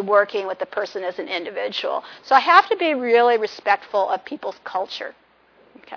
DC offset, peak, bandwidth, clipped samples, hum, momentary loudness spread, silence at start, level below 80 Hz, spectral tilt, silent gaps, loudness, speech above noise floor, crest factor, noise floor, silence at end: under 0.1%; 0 dBFS; 5.4 kHz; under 0.1%; none; 15 LU; 0 s; -74 dBFS; -3.5 dB/octave; none; -20 LUFS; 35 dB; 20 dB; -55 dBFS; 0 s